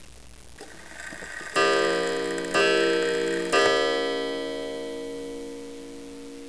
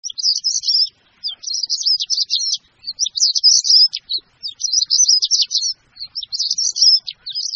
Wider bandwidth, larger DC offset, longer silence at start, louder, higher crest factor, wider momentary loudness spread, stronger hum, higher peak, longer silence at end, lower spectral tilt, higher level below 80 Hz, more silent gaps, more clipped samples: first, 11 kHz vs 8 kHz; first, 0.4% vs under 0.1%; about the same, 0 s vs 0.05 s; second, -25 LUFS vs -14 LUFS; about the same, 18 dB vs 18 dB; first, 20 LU vs 15 LU; first, 60 Hz at -60 dBFS vs none; second, -8 dBFS vs 0 dBFS; about the same, 0 s vs 0 s; first, -3 dB/octave vs 5.5 dB/octave; first, -56 dBFS vs -68 dBFS; neither; neither